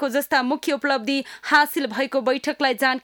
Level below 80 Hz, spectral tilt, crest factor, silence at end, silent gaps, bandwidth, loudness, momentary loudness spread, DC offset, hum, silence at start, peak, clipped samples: -68 dBFS; -2.5 dB/octave; 16 dB; 0.05 s; none; over 20 kHz; -21 LUFS; 6 LU; under 0.1%; none; 0 s; -4 dBFS; under 0.1%